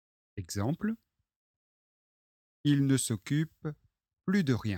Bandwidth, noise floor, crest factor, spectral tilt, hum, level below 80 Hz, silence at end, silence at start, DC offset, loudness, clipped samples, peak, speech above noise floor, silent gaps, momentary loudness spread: 17 kHz; under -90 dBFS; 18 dB; -5.5 dB/octave; none; -64 dBFS; 0 s; 0.35 s; under 0.1%; -31 LUFS; under 0.1%; -14 dBFS; over 60 dB; 1.36-2.64 s; 15 LU